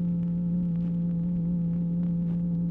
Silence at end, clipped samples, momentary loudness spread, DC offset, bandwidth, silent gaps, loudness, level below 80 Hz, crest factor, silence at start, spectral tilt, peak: 0 s; under 0.1%; 0 LU; under 0.1%; 1.4 kHz; none; -28 LUFS; -48 dBFS; 6 dB; 0 s; -13 dB/octave; -20 dBFS